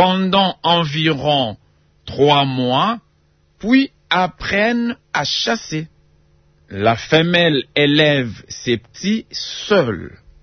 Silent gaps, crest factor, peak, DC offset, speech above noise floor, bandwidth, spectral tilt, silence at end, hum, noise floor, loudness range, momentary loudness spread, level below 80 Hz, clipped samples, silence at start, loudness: none; 16 dB; 0 dBFS; under 0.1%; 41 dB; 6.6 kHz; -5 dB/octave; 0.35 s; none; -58 dBFS; 2 LU; 13 LU; -50 dBFS; under 0.1%; 0 s; -17 LUFS